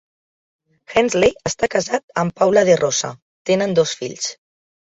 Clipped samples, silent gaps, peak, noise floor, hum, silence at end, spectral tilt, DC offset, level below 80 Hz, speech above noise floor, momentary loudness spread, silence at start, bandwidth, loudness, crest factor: under 0.1%; 2.03-2.08 s, 3.22-3.45 s; -2 dBFS; under -90 dBFS; none; 0.5 s; -4 dB/octave; under 0.1%; -52 dBFS; over 72 dB; 11 LU; 0.9 s; 8 kHz; -18 LUFS; 18 dB